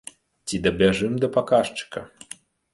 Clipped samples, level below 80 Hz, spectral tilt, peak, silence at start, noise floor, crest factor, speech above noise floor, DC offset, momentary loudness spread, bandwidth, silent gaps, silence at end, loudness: under 0.1%; -50 dBFS; -5 dB/octave; -6 dBFS; 0.45 s; -46 dBFS; 18 dB; 24 dB; under 0.1%; 21 LU; 11.5 kHz; none; 0.65 s; -22 LUFS